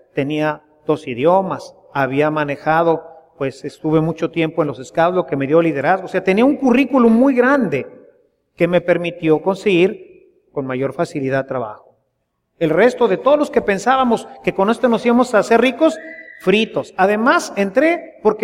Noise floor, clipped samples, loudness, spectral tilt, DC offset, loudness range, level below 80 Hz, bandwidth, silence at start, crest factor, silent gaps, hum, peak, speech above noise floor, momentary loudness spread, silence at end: -70 dBFS; under 0.1%; -17 LUFS; -6 dB/octave; under 0.1%; 4 LU; -54 dBFS; 13.5 kHz; 0.15 s; 16 dB; none; none; -2 dBFS; 54 dB; 11 LU; 0 s